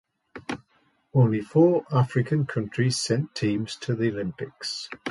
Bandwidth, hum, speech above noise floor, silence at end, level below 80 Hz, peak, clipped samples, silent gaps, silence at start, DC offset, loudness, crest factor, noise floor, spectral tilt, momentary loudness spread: 11.5 kHz; none; 42 dB; 0 s; -60 dBFS; -6 dBFS; under 0.1%; none; 0.35 s; under 0.1%; -25 LUFS; 18 dB; -66 dBFS; -6 dB/octave; 14 LU